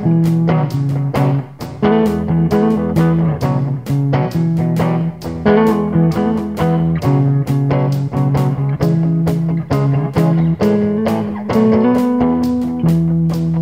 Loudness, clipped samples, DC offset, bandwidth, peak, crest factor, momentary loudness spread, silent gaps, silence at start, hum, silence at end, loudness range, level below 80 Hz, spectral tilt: -15 LUFS; under 0.1%; 0.4%; 15.5 kHz; 0 dBFS; 14 dB; 4 LU; none; 0 s; none; 0 s; 1 LU; -38 dBFS; -9 dB/octave